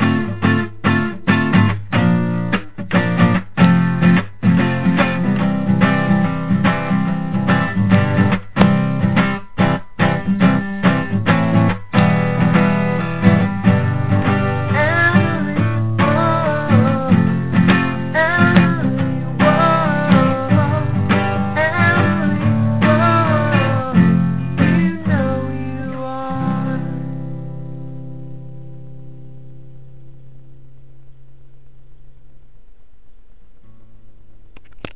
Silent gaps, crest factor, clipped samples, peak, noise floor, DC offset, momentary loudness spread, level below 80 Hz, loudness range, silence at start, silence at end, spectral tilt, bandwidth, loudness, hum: none; 16 dB; under 0.1%; 0 dBFS; -46 dBFS; 3%; 9 LU; -40 dBFS; 8 LU; 0 s; 0.15 s; -11.5 dB/octave; 4 kHz; -16 LUFS; none